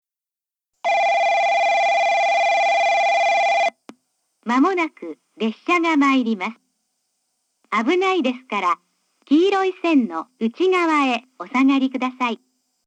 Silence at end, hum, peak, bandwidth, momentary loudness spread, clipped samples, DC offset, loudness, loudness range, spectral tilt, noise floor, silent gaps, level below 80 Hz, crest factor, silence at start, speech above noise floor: 0.5 s; none; -6 dBFS; 9 kHz; 9 LU; under 0.1%; under 0.1%; -19 LUFS; 4 LU; -4 dB/octave; -88 dBFS; none; -90 dBFS; 14 dB; 0.85 s; 69 dB